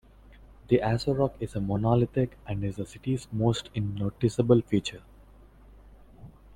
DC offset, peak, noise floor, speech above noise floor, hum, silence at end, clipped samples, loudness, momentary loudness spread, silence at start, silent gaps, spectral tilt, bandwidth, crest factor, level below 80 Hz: under 0.1%; -8 dBFS; -53 dBFS; 26 dB; none; 0.25 s; under 0.1%; -28 LUFS; 10 LU; 0.7 s; none; -7.5 dB/octave; 11 kHz; 22 dB; -50 dBFS